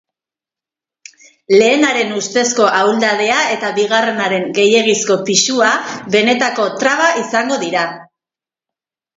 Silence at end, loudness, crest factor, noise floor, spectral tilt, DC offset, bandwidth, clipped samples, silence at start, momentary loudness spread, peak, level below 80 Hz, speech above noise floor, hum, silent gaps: 1.15 s; -13 LUFS; 16 dB; -89 dBFS; -2.5 dB/octave; under 0.1%; 7.8 kHz; under 0.1%; 1.5 s; 5 LU; 0 dBFS; -64 dBFS; 75 dB; none; none